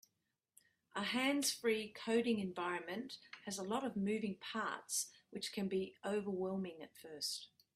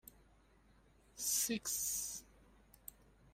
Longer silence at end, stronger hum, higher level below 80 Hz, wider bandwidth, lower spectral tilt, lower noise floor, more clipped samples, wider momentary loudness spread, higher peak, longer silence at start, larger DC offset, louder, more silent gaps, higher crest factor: second, 0.3 s vs 1.1 s; neither; second, -82 dBFS vs -68 dBFS; about the same, 15.5 kHz vs 16 kHz; first, -3.5 dB/octave vs -1 dB/octave; first, -86 dBFS vs -68 dBFS; neither; second, 11 LU vs 22 LU; about the same, -22 dBFS vs -22 dBFS; second, 0.95 s vs 1.15 s; neither; about the same, -40 LUFS vs -38 LUFS; neither; about the same, 18 dB vs 22 dB